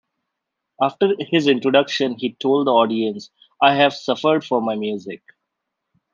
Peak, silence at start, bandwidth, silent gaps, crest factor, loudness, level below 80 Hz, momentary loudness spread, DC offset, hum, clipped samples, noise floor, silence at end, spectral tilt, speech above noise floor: -2 dBFS; 0.8 s; 7.4 kHz; none; 18 dB; -19 LUFS; -70 dBFS; 10 LU; under 0.1%; none; under 0.1%; -80 dBFS; 1 s; -5.5 dB/octave; 61 dB